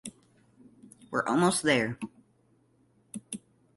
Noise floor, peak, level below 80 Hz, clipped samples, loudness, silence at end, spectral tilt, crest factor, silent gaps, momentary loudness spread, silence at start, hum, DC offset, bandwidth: -67 dBFS; -10 dBFS; -68 dBFS; under 0.1%; -28 LUFS; 0.4 s; -4 dB/octave; 22 dB; none; 21 LU; 0.05 s; none; under 0.1%; 12 kHz